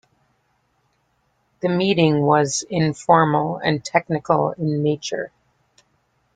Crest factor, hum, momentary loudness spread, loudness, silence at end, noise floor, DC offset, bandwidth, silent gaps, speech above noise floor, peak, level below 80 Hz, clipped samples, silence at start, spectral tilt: 20 dB; none; 10 LU; -20 LUFS; 1.1 s; -67 dBFS; under 0.1%; 9.4 kHz; none; 48 dB; -2 dBFS; -60 dBFS; under 0.1%; 1.65 s; -5.5 dB/octave